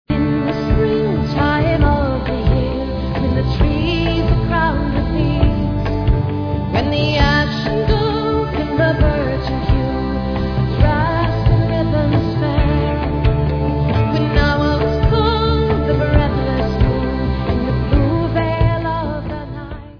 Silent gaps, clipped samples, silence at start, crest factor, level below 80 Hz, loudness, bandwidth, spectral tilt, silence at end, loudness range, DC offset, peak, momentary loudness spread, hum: none; under 0.1%; 0.1 s; 16 dB; -22 dBFS; -17 LUFS; 5.4 kHz; -8.5 dB/octave; 0 s; 1 LU; under 0.1%; 0 dBFS; 5 LU; none